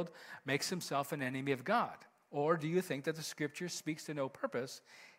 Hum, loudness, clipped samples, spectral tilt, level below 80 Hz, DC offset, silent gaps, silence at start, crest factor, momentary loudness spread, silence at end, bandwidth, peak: none; -38 LUFS; under 0.1%; -4.5 dB/octave; -84 dBFS; under 0.1%; none; 0 s; 20 dB; 10 LU; 0.05 s; 16 kHz; -18 dBFS